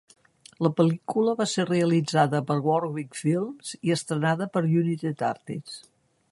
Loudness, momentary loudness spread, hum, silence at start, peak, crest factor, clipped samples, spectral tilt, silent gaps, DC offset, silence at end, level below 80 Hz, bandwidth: -25 LUFS; 10 LU; none; 0.6 s; -6 dBFS; 20 dB; under 0.1%; -6 dB/octave; none; under 0.1%; 0.55 s; -70 dBFS; 11.5 kHz